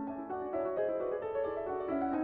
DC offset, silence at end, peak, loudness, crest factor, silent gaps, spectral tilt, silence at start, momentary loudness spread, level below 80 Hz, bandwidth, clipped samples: under 0.1%; 0 s; -22 dBFS; -36 LUFS; 12 dB; none; -6 dB/octave; 0 s; 4 LU; -64 dBFS; 4.5 kHz; under 0.1%